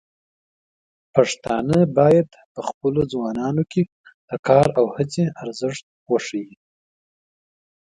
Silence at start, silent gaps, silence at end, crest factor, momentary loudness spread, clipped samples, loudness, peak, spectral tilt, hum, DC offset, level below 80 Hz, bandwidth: 1.15 s; 2.45-2.55 s, 2.74-2.81 s, 3.92-4.04 s, 4.14-4.28 s, 4.39-4.43 s, 5.83-6.06 s; 1.5 s; 20 dB; 15 LU; under 0.1%; -21 LUFS; -2 dBFS; -6.5 dB/octave; none; under 0.1%; -54 dBFS; 11 kHz